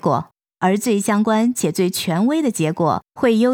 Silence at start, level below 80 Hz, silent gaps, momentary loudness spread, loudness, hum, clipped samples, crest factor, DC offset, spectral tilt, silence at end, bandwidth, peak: 0.05 s; -64 dBFS; none; 4 LU; -19 LUFS; none; under 0.1%; 14 dB; under 0.1%; -5.5 dB/octave; 0 s; over 20 kHz; -4 dBFS